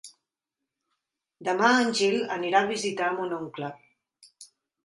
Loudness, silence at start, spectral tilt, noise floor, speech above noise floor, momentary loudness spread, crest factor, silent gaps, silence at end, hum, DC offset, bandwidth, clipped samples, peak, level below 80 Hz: -25 LUFS; 0.05 s; -3.5 dB/octave; -87 dBFS; 62 dB; 14 LU; 20 dB; none; 0.4 s; none; under 0.1%; 11.5 kHz; under 0.1%; -8 dBFS; -76 dBFS